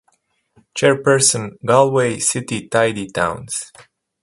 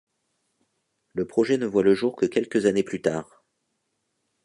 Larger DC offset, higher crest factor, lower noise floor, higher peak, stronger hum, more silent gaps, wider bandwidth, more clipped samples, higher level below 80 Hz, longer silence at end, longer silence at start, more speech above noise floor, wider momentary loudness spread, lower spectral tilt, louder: neither; about the same, 18 dB vs 20 dB; second, -64 dBFS vs -76 dBFS; first, 0 dBFS vs -6 dBFS; neither; neither; about the same, 11.5 kHz vs 11 kHz; neither; first, -54 dBFS vs -64 dBFS; second, 0.4 s vs 1.2 s; second, 0.75 s vs 1.15 s; second, 47 dB vs 53 dB; first, 13 LU vs 10 LU; second, -3.5 dB/octave vs -6 dB/octave; first, -17 LUFS vs -24 LUFS